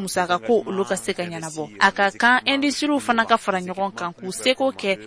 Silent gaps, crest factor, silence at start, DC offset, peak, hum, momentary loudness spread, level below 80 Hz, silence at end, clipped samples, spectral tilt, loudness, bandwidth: none; 18 dB; 0 s; under 0.1%; -4 dBFS; none; 11 LU; -60 dBFS; 0 s; under 0.1%; -3.5 dB/octave; -21 LUFS; 11 kHz